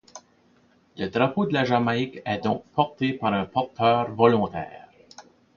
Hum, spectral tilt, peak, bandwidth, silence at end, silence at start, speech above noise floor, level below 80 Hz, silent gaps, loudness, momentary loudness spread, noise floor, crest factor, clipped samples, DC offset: none; -7 dB/octave; -2 dBFS; 7.2 kHz; 0.35 s; 0.15 s; 37 dB; -58 dBFS; none; -24 LUFS; 9 LU; -60 dBFS; 22 dB; under 0.1%; under 0.1%